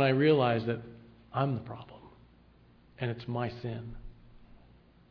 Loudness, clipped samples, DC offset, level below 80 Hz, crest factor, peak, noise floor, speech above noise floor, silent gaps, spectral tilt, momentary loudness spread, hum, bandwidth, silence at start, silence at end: -31 LUFS; under 0.1%; under 0.1%; -56 dBFS; 20 dB; -14 dBFS; -60 dBFS; 30 dB; none; -9.5 dB/octave; 23 LU; none; 5.4 kHz; 0 s; 0.75 s